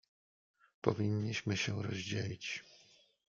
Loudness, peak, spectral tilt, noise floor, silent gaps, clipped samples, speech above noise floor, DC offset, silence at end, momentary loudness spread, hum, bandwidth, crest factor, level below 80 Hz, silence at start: -38 LUFS; -14 dBFS; -5 dB/octave; -66 dBFS; none; under 0.1%; 29 dB; under 0.1%; 0.65 s; 7 LU; none; 7.4 kHz; 26 dB; -74 dBFS; 0.85 s